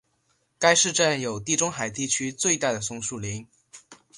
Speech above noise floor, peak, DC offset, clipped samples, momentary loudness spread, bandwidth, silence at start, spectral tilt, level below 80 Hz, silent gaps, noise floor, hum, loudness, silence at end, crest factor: 45 dB; -4 dBFS; under 0.1%; under 0.1%; 12 LU; 11.5 kHz; 0.6 s; -2 dB/octave; -60 dBFS; none; -70 dBFS; none; -24 LUFS; 0 s; 24 dB